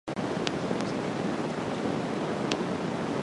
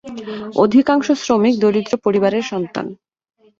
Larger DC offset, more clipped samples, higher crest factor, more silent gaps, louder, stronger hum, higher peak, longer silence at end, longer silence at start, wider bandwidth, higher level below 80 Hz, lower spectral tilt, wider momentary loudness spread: neither; neither; first, 22 dB vs 16 dB; neither; second, -31 LUFS vs -16 LUFS; neither; second, -8 dBFS vs -2 dBFS; second, 0 s vs 0.65 s; about the same, 0.05 s vs 0.05 s; first, 11.5 kHz vs 7.6 kHz; about the same, -58 dBFS vs -58 dBFS; about the same, -5.5 dB/octave vs -6 dB/octave; second, 2 LU vs 14 LU